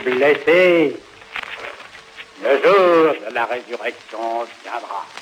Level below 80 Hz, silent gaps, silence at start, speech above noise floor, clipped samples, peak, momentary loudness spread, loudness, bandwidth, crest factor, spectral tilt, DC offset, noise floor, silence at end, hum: -66 dBFS; none; 0 s; 23 dB; under 0.1%; -4 dBFS; 21 LU; -17 LUFS; 14.5 kHz; 14 dB; -5 dB/octave; under 0.1%; -40 dBFS; 0 s; none